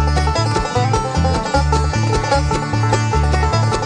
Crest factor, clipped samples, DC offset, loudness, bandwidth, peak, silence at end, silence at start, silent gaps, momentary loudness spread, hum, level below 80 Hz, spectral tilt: 14 dB; under 0.1%; 0.1%; -17 LUFS; 10 kHz; -2 dBFS; 0 s; 0 s; none; 2 LU; none; -22 dBFS; -5.5 dB/octave